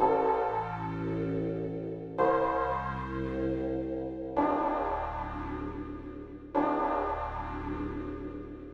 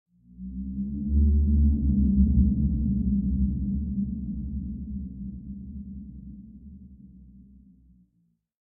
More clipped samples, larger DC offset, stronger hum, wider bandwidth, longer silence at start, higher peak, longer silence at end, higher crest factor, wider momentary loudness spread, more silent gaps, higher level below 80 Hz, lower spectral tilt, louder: neither; neither; neither; first, 7.2 kHz vs 0.8 kHz; second, 0 s vs 0.4 s; second, -14 dBFS vs -10 dBFS; second, 0 s vs 1.4 s; about the same, 18 dB vs 16 dB; second, 11 LU vs 21 LU; neither; second, -46 dBFS vs -30 dBFS; second, -9 dB/octave vs -19 dB/octave; second, -32 LUFS vs -26 LUFS